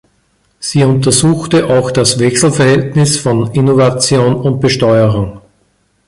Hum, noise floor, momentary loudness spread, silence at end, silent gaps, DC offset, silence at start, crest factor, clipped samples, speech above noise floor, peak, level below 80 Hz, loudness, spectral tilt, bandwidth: none; -57 dBFS; 4 LU; 0.7 s; none; under 0.1%; 0.6 s; 12 dB; under 0.1%; 46 dB; 0 dBFS; -40 dBFS; -10 LUFS; -5 dB/octave; 11.5 kHz